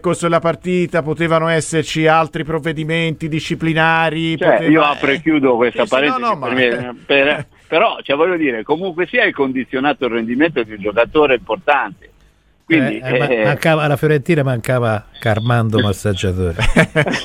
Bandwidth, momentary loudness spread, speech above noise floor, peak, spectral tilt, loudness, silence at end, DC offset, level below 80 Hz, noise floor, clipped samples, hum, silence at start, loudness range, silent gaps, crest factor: 15.5 kHz; 6 LU; 37 dB; 0 dBFS; -6 dB/octave; -16 LUFS; 0 s; under 0.1%; -36 dBFS; -53 dBFS; under 0.1%; none; 0.05 s; 2 LU; none; 16 dB